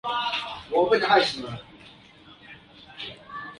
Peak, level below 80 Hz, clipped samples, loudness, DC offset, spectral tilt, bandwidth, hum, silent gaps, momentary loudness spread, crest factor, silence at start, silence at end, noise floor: -6 dBFS; -60 dBFS; under 0.1%; -24 LUFS; under 0.1%; -4 dB/octave; 11.5 kHz; none; none; 26 LU; 22 dB; 0.05 s; 0.05 s; -51 dBFS